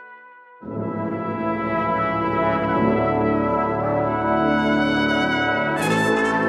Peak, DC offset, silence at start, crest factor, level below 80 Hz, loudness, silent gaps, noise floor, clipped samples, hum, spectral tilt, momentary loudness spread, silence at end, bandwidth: -8 dBFS; under 0.1%; 0 s; 14 dB; -46 dBFS; -21 LUFS; none; -45 dBFS; under 0.1%; none; -6 dB/octave; 7 LU; 0 s; 13 kHz